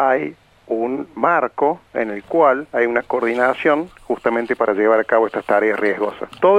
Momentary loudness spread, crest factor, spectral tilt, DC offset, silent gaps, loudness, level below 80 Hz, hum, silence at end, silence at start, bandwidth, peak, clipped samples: 8 LU; 16 dB; -6.5 dB/octave; under 0.1%; none; -18 LUFS; -58 dBFS; none; 0 s; 0 s; 10.5 kHz; -2 dBFS; under 0.1%